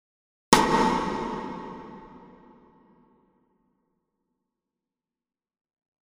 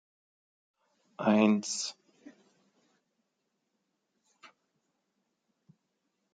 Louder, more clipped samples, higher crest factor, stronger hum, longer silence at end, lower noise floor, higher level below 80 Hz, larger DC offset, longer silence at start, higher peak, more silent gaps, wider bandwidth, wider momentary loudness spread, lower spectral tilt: first, -24 LUFS vs -29 LUFS; neither; about the same, 28 dB vs 24 dB; neither; second, 3.9 s vs 4.4 s; first, under -90 dBFS vs -82 dBFS; first, -52 dBFS vs -88 dBFS; neither; second, 0.5 s vs 1.2 s; first, -2 dBFS vs -12 dBFS; neither; first, 15.5 kHz vs 9.4 kHz; first, 24 LU vs 10 LU; about the same, -3.5 dB/octave vs -4.5 dB/octave